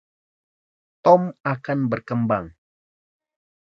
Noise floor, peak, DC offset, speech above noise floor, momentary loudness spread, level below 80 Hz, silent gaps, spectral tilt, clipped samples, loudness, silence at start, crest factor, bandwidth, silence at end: under -90 dBFS; -2 dBFS; under 0.1%; over 70 dB; 10 LU; -58 dBFS; none; -9 dB/octave; under 0.1%; -21 LUFS; 1.05 s; 22 dB; 6.6 kHz; 1.2 s